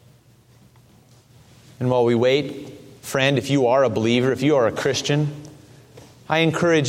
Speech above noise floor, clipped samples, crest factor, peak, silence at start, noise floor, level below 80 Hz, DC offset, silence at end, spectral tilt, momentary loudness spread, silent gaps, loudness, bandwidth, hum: 34 dB; under 0.1%; 18 dB; -2 dBFS; 1.8 s; -53 dBFS; -58 dBFS; under 0.1%; 0 s; -5.5 dB/octave; 13 LU; none; -20 LUFS; 16 kHz; none